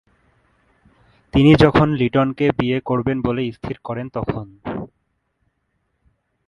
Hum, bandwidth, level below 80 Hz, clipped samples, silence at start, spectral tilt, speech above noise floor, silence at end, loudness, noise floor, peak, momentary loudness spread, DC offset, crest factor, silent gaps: none; 10.5 kHz; -40 dBFS; under 0.1%; 1.35 s; -8.5 dB/octave; 53 dB; 1.6 s; -18 LUFS; -70 dBFS; 0 dBFS; 17 LU; under 0.1%; 20 dB; none